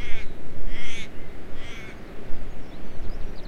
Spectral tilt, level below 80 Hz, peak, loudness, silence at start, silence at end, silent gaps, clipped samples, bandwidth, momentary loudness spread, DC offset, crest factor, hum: -5 dB/octave; -32 dBFS; -6 dBFS; -39 LUFS; 0 s; 0 s; none; under 0.1%; 6.8 kHz; 6 LU; under 0.1%; 12 dB; none